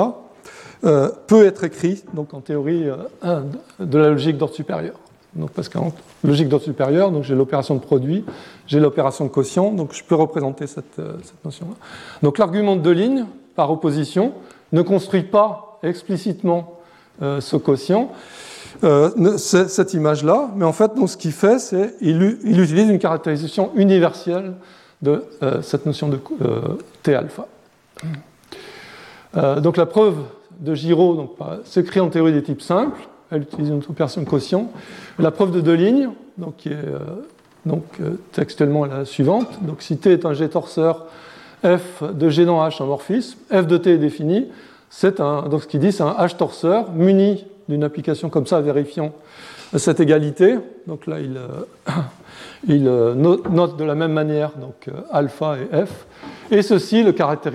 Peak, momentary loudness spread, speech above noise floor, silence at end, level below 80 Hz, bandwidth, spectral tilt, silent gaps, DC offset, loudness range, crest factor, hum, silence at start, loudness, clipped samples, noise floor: 0 dBFS; 16 LU; 24 dB; 0 s; -62 dBFS; 13 kHz; -7 dB/octave; none; under 0.1%; 5 LU; 18 dB; none; 0 s; -18 LUFS; under 0.1%; -41 dBFS